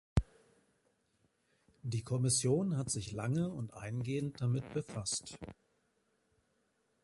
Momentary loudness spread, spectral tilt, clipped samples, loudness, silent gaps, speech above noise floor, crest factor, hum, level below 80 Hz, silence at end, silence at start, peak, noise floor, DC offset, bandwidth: 15 LU; -5 dB/octave; under 0.1%; -36 LUFS; none; 42 dB; 22 dB; none; -52 dBFS; 1.5 s; 0.15 s; -16 dBFS; -78 dBFS; under 0.1%; 11.5 kHz